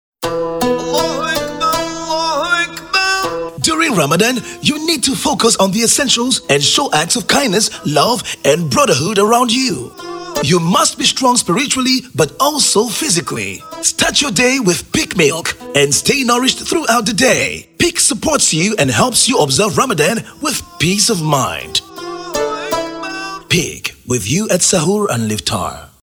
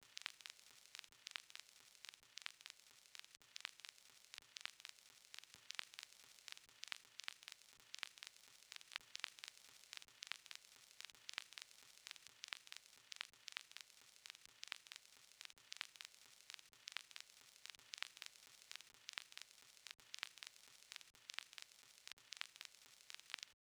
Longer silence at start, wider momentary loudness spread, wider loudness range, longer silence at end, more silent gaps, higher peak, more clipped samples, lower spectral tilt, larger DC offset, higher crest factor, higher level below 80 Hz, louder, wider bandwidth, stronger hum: first, 0.2 s vs 0 s; about the same, 8 LU vs 8 LU; about the same, 4 LU vs 2 LU; about the same, 0.15 s vs 0.15 s; second, none vs 22.13-22.17 s; first, 0 dBFS vs -20 dBFS; neither; first, -3 dB/octave vs 2.5 dB/octave; neither; second, 14 dB vs 38 dB; first, -44 dBFS vs under -90 dBFS; first, -13 LUFS vs -55 LUFS; about the same, over 20 kHz vs over 20 kHz; neither